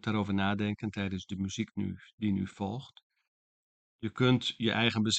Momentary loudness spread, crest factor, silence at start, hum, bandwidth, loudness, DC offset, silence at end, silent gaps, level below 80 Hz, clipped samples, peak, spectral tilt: 11 LU; 20 dB; 0.05 s; none; 9 kHz; -32 LUFS; under 0.1%; 0 s; 2.13-2.18 s, 3.03-3.10 s, 3.28-3.99 s; -66 dBFS; under 0.1%; -12 dBFS; -5 dB/octave